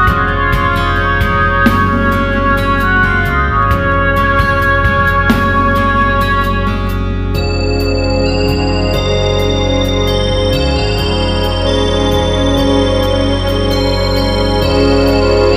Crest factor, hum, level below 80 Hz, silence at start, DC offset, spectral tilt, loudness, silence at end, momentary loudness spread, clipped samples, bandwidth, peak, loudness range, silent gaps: 12 dB; none; -20 dBFS; 0 s; under 0.1%; -6 dB/octave; -12 LUFS; 0 s; 3 LU; under 0.1%; 15.5 kHz; 0 dBFS; 2 LU; none